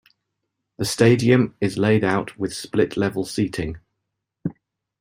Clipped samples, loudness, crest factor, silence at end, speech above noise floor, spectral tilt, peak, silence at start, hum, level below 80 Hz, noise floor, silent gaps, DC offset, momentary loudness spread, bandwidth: under 0.1%; -21 LUFS; 20 dB; 0.5 s; 60 dB; -6 dB/octave; -2 dBFS; 0.8 s; none; -50 dBFS; -80 dBFS; none; under 0.1%; 16 LU; 16 kHz